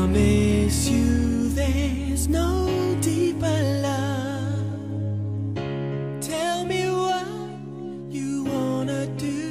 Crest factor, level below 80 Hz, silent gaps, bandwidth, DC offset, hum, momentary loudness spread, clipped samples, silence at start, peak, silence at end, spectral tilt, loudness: 16 dB; -36 dBFS; none; 15.5 kHz; 0.2%; none; 9 LU; under 0.1%; 0 s; -8 dBFS; 0 s; -6 dB/octave; -24 LUFS